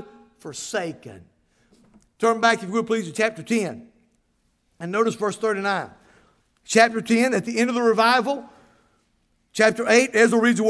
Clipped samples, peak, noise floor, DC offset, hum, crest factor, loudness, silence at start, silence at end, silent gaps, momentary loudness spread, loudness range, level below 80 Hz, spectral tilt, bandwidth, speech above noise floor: under 0.1%; -2 dBFS; -68 dBFS; under 0.1%; none; 20 dB; -21 LUFS; 0 s; 0 s; none; 17 LU; 5 LU; -68 dBFS; -4 dB/octave; 11 kHz; 47 dB